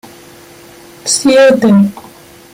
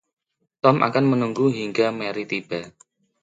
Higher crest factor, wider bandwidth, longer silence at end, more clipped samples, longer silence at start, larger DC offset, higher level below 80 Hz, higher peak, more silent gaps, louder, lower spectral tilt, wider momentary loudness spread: second, 12 dB vs 20 dB; first, 16 kHz vs 9 kHz; about the same, 0.55 s vs 0.55 s; neither; first, 1.05 s vs 0.65 s; neither; first, -52 dBFS vs -66 dBFS; about the same, 0 dBFS vs -2 dBFS; neither; first, -9 LUFS vs -22 LUFS; second, -4.5 dB/octave vs -7 dB/octave; about the same, 9 LU vs 10 LU